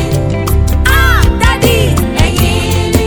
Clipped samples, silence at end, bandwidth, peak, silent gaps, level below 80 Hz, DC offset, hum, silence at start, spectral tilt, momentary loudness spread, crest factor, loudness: 0.7%; 0 s; over 20 kHz; 0 dBFS; none; -14 dBFS; under 0.1%; none; 0 s; -5 dB/octave; 4 LU; 10 dB; -11 LUFS